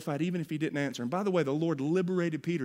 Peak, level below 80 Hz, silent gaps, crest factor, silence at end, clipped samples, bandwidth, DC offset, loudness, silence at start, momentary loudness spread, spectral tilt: -16 dBFS; -74 dBFS; none; 16 dB; 0 s; under 0.1%; 15.5 kHz; under 0.1%; -31 LUFS; 0 s; 4 LU; -7 dB/octave